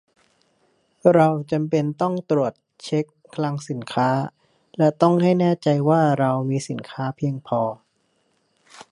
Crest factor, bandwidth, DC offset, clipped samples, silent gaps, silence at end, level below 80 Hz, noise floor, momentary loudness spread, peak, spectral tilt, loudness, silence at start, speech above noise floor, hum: 20 dB; 11 kHz; under 0.1%; under 0.1%; none; 0.1 s; -66 dBFS; -67 dBFS; 12 LU; -2 dBFS; -7.5 dB/octave; -21 LUFS; 1.05 s; 47 dB; none